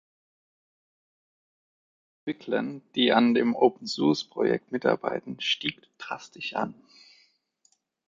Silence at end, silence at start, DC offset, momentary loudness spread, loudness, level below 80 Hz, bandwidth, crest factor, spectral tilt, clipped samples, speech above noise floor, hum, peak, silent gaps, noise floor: 1.35 s; 2.25 s; under 0.1%; 15 LU; -27 LUFS; -72 dBFS; 7.6 kHz; 22 dB; -5 dB/octave; under 0.1%; 43 dB; none; -8 dBFS; none; -69 dBFS